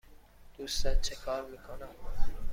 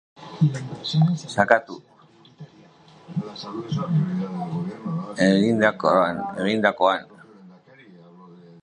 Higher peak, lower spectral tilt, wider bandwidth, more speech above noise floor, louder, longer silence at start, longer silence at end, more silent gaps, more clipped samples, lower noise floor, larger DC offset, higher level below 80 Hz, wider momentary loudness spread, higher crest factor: second, -14 dBFS vs 0 dBFS; second, -3 dB/octave vs -6.5 dB/octave; first, 14.5 kHz vs 10 kHz; second, 26 dB vs 31 dB; second, -38 LUFS vs -23 LUFS; first, 0.5 s vs 0.2 s; second, 0 s vs 0.25 s; neither; neither; about the same, -54 dBFS vs -53 dBFS; neither; first, -36 dBFS vs -62 dBFS; about the same, 13 LU vs 13 LU; second, 16 dB vs 24 dB